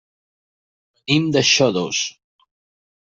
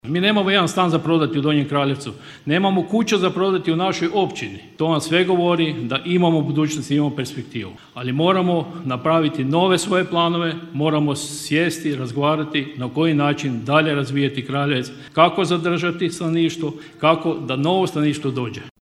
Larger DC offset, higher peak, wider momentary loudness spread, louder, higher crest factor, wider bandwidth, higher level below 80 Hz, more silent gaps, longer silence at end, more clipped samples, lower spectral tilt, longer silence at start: neither; about the same, -2 dBFS vs 0 dBFS; first, 12 LU vs 8 LU; first, -17 LUFS vs -20 LUFS; about the same, 20 dB vs 20 dB; second, 8 kHz vs 13.5 kHz; about the same, -64 dBFS vs -60 dBFS; neither; first, 1.05 s vs 0.15 s; neither; second, -3.5 dB/octave vs -5.5 dB/octave; first, 1.1 s vs 0.05 s